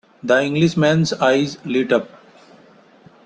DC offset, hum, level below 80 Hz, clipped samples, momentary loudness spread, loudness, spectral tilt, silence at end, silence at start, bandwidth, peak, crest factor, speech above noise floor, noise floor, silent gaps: under 0.1%; none; -58 dBFS; under 0.1%; 6 LU; -18 LUFS; -6 dB/octave; 1.2 s; 0.25 s; 8.8 kHz; -2 dBFS; 18 dB; 32 dB; -49 dBFS; none